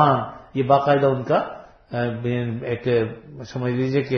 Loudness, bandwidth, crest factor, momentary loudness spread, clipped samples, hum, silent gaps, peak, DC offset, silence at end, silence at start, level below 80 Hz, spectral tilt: -22 LUFS; 6.4 kHz; 18 dB; 14 LU; under 0.1%; none; none; -2 dBFS; under 0.1%; 0 s; 0 s; -56 dBFS; -8 dB/octave